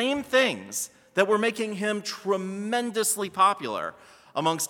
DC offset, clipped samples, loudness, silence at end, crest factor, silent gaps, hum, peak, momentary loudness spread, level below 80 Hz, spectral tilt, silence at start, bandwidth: under 0.1%; under 0.1%; -26 LUFS; 0 s; 20 dB; none; none; -6 dBFS; 9 LU; -72 dBFS; -3 dB/octave; 0 s; 18 kHz